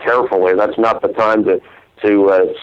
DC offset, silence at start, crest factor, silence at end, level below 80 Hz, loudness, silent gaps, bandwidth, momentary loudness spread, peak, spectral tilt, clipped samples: under 0.1%; 0 s; 12 dB; 0 s; -54 dBFS; -14 LUFS; none; 7 kHz; 6 LU; -2 dBFS; -7 dB/octave; under 0.1%